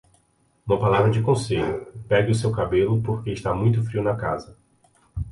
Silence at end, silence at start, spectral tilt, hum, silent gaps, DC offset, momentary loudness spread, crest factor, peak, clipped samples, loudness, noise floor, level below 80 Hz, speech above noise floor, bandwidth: 0 s; 0.65 s; -7 dB/octave; none; none; under 0.1%; 12 LU; 16 dB; -6 dBFS; under 0.1%; -23 LUFS; -64 dBFS; -44 dBFS; 42 dB; 11.5 kHz